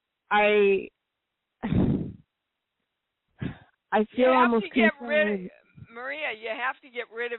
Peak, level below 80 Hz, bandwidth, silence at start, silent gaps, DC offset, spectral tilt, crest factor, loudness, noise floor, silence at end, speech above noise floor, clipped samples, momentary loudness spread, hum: -8 dBFS; -52 dBFS; 4.2 kHz; 0.3 s; none; under 0.1%; -4 dB/octave; 18 dB; -25 LUFS; -83 dBFS; 0 s; 59 dB; under 0.1%; 17 LU; none